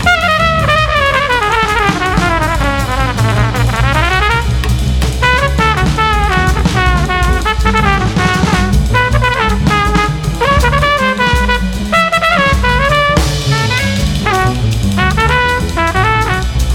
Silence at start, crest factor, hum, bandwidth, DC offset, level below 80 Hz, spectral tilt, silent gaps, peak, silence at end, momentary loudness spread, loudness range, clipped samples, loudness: 0 s; 12 dB; none; 16.5 kHz; under 0.1%; -18 dBFS; -5 dB/octave; none; 0 dBFS; 0 s; 4 LU; 1 LU; under 0.1%; -11 LUFS